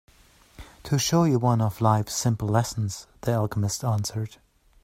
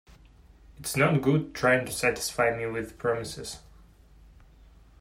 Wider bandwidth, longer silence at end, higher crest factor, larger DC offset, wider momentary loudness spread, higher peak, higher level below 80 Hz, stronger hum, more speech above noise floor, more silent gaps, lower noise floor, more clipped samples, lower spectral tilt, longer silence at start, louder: about the same, 16 kHz vs 16 kHz; second, 0.55 s vs 1.4 s; about the same, 20 dB vs 20 dB; neither; second, 11 LU vs 14 LU; first, -6 dBFS vs -10 dBFS; about the same, -52 dBFS vs -54 dBFS; neither; first, 32 dB vs 28 dB; neither; about the same, -56 dBFS vs -54 dBFS; neither; about the same, -5.5 dB/octave vs -5 dB/octave; about the same, 0.6 s vs 0.7 s; about the same, -25 LUFS vs -27 LUFS